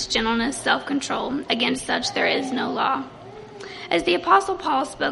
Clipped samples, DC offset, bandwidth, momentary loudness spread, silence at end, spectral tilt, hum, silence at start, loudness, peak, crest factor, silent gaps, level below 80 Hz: under 0.1%; under 0.1%; 11.5 kHz; 17 LU; 0 s; -3 dB/octave; none; 0 s; -22 LUFS; -4 dBFS; 20 dB; none; -52 dBFS